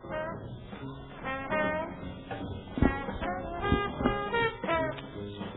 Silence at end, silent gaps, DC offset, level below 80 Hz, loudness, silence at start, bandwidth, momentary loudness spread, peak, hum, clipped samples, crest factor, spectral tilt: 0 s; none; under 0.1%; -44 dBFS; -33 LUFS; 0 s; 3.9 kHz; 13 LU; -10 dBFS; none; under 0.1%; 22 dB; -3 dB/octave